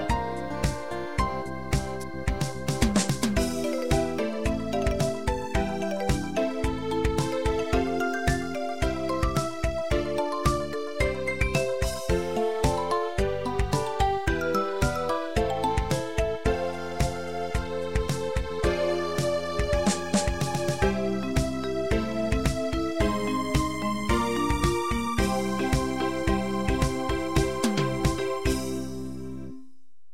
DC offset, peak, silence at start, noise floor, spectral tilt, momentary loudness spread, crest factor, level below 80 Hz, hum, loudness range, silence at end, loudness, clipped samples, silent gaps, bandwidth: 1%; -8 dBFS; 0 s; -61 dBFS; -5.5 dB/octave; 4 LU; 18 dB; -34 dBFS; none; 2 LU; 0.45 s; -27 LUFS; under 0.1%; none; 16 kHz